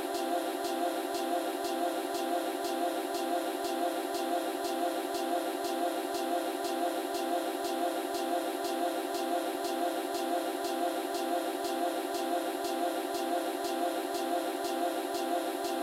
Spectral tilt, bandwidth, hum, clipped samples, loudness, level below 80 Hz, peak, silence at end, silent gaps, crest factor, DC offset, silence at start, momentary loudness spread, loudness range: -2 dB/octave; 16.5 kHz; none; under 0.1%; -33 LUFS; -78 dBFS; -20 dBFS; 0 s; none; 12 dB; under 0.1%; 0 s; 1 LU; 0 LU